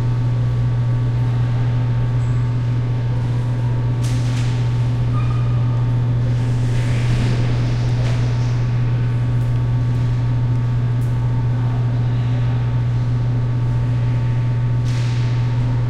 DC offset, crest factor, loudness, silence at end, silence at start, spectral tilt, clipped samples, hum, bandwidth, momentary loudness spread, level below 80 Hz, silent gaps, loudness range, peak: under 0.1%; 10 dB; -19 LUFS; 0 s; 0 s; -8 dB/octave; under 0.1%; none; 7.6 kHz; 1 LU; -30 dBFS; none; 1 LU; -6 dBFS